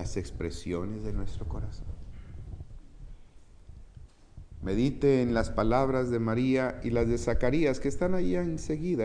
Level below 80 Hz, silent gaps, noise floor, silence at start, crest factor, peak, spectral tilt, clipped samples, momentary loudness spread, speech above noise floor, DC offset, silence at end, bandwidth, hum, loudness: -40 dBFS; none; -51 dBFS; 0 s; 18 dB; -10 dBFS; -7 dB/octave; under 0.1%; 19 LU; 23 dB; under 0.1%; 0 s; 10 kHz; none; -29 LUFS